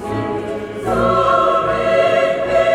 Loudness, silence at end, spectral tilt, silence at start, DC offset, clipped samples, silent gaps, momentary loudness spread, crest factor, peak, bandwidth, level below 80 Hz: -16 LUFS; 0 s; -6 dB/octave; 0 s; under 0.1%; under 0.1%; none; 10 LU; 14 dB; -2 dBFS; 13 kHz; -40 dBFS